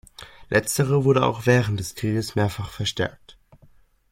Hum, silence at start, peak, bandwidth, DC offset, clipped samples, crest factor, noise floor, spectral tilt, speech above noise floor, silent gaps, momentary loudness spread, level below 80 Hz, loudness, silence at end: none; 0.2 s; -4 dBFS; 16.5 kHz; under 0.1%; under 0.1%; 20 dB; -55 dBFS; -5.5 dB/octave; 33 dB; none; 9 LU; -50 dBFS; -23 LUFS; 0.8 s